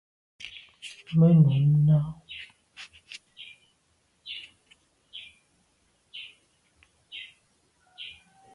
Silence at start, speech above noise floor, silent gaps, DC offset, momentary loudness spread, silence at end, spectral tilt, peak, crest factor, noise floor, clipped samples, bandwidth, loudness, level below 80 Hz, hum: 0.45 s; 50 dB; none; under 0.1%; 26 LU; 0.45 s; -8.5 dB/octave; -10 dBFS; 20 dB; -69 dBFS; under 0.1%; 7.2 kHz; -22 LUFS; -62 dBFS; none